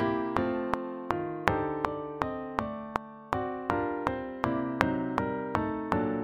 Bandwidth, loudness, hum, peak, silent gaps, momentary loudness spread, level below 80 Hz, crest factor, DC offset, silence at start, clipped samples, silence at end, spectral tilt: 16.5 kHz; -32 LUFS; none; -2 dBFS; none; 6 LU; -52 dBFS; 30 dB; under 0.1%; 0 s; under 0.1%; 0 s; -7 dB/octave